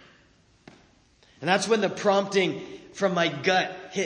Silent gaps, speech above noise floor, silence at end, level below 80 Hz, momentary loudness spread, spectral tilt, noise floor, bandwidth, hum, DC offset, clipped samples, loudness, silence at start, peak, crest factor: none; 36 dB; 0 s; -68 dBFS; 9 LU; -4 dB/octave; -60 dBFS; 10.5 kHz; none; under 0.1%; under 0.1%; -25 LUFS; 1.4 s; -8 dBFS; 18 dB